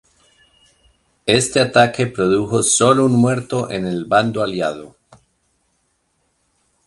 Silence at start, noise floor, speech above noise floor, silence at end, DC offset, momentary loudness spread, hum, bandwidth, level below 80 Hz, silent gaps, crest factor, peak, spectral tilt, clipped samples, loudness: 1.25 s; -66 dBFS; 50 dB; 2 s; under 0.1%; 10 LU; none; 11.5 kHz; -52 dBFS; none; 18 dB; 0 dBFS; -4 dB/octave; under 0.1%; -16 LUFS